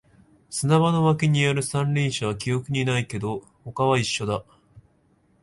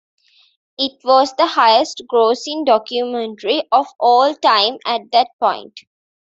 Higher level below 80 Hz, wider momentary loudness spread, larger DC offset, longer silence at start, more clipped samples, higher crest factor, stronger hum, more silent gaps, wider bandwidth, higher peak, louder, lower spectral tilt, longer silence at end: first, -54 dBFS vs -70 dBFS; about the same, 11 LU vs 9 LU; neither; second, 0.5 s vs 0.8 s; neither; about the same, 18 dB vs 16 dB; neither; second, none vs 5.33-5.39 s; first, 11.5 kHz vs 7.8 kHz; second, -6 dBFS vs -2 dBFS; second, -23 LUFS vs -16 LUFS; first, -5.5 dB/octave vs -2 dB/octave; about the same, 0.6 s vs 0.6 s